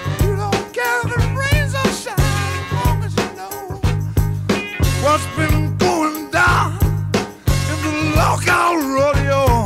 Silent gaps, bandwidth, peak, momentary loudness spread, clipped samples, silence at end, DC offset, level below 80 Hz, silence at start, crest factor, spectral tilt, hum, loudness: none; 16 kHz; -2 dBFS; 6 LU; under 0.1%; 0 s; under 0.1%; -26 dBFS; 0 s; 14 dB; -5.5 dB/octave; none; -18 LUFS